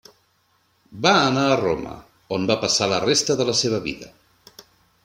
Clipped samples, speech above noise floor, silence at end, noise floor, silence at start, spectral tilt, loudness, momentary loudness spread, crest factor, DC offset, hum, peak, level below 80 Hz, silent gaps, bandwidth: under 0.1%; 44 dB; 0.95 s; -64 dBFS; 0.9 s; -3.5 dB/octave; -20 LUFS; 14 LU; 22 dB; under 0.1%; none; -2 dBFS; -56 dBFS; none; 16.5 kHz